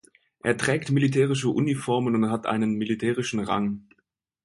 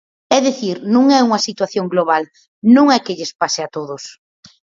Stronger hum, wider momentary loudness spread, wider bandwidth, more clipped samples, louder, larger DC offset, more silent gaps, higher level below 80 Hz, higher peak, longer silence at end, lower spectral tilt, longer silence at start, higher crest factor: neither; second, 5 LU vs 15 LU; first, 11.5 kHz vs 7.6 kHz; neither; second, -25 LUFS vs -15 LUFS; neither; second, none vs 2.48-2.62 s, 3.35-3.39 s; first, -60 dBFS vs -66 dBFS; second, -8 dBFS vs 0 dBFS; about the same, 0.65 s vs 0.65 s; first, -6 dB/octave vs -4 dB/octave; first, 0.45 s vs 0.3 s; about the same, 18 dB vs 16 dB